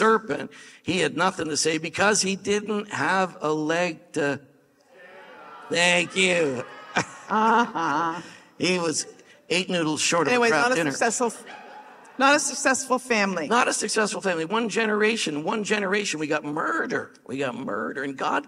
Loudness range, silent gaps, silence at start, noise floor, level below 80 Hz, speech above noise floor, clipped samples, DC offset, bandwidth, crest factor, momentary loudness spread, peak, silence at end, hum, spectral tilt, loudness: 3 LU; none; 0 s; -57 dBFS; -70 dBFS; 33 dB; under 0.1%; under 0.1%; 14.5 kHz; 20 dB; 10 LU; -6 dBFS; 0 s; none; -3 dB/octave; -24 LUFS